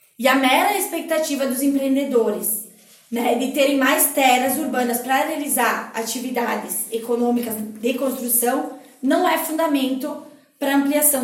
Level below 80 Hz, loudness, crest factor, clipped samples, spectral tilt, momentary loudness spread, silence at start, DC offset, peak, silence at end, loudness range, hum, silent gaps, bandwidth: -70 dBFS; -20 LUFS; 18 dB; under 0.1%; -2 dB/octave; 10 LU; 0.2 s; under 0.1%; -2 dBFS; 0 s; 3 LU; none; none; 17 kHz